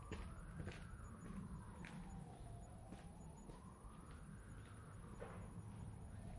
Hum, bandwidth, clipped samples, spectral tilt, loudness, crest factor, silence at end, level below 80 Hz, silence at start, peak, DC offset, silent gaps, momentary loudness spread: none; 11.5 kHz; under 0.1%; -6.5 dB/octave; -56 LUFS; 18 dB; 0 s; -60 dBFS; 0 s; -36 dBFS; under 0.1%; none; 5 LU